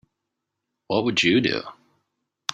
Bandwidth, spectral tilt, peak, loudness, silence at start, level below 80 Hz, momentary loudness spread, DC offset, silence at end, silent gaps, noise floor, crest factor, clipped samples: 9.4 kHz; -4.5 dB/octave; -2 dBFS; -22 LUFS; 0.9 s; -64 dBFS; 14 LU; under 0.1%; 0 s; none; -82 dBFS; 24 dB; under 0.1%